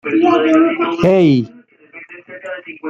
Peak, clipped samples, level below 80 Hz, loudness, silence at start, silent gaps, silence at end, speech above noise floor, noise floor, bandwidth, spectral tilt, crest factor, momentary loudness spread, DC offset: -2 dBFS; under 0.1%; -54 dBFS; -13 LUFS; 0.05 s; none; 0 s; 28 dB; -40 dBFS; 7.4 kHz; -7.5 dB/octave; 14 dB; 22 LU; under 0.1%